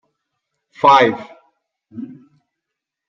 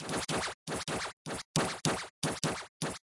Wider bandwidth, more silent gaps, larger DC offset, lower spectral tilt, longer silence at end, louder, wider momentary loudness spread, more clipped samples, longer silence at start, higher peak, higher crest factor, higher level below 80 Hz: second, 7.4 kHz vs 11.5 kHz; second, none vs 0.54-0.66 s, 1.13-1.25 s, 1.45-1.54 s, 2.10-2.22 s, 2.69-2.80 s; neither; first, -5 dB/octave vs -3.5 dB/octave; first, 1.05 s vs 0.15 s; first, -13 LUFS vs -35 LUFS; first, 23 LU vs 6 LU; neither; first, 0.85 s vs 0 s; first, 0 dBFS vs -12 dBFS; about the same, 20 dB vs 24 dB; second, -68 dBFS vs -60 dBFS